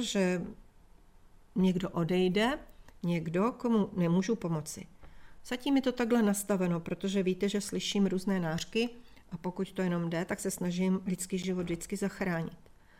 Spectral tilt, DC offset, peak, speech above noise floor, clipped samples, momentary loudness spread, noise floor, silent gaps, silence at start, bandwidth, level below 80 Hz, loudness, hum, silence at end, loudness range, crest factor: -5.5 dB/octave; under 0.1%; -16 dBFS; 26 dB; under 0.1%; 8 LU; -57 dBFS; none; 0 s; 16 kHz; -58 dBFS; -32 LUFS; none; 0.4 s; 3 LU; 16 dB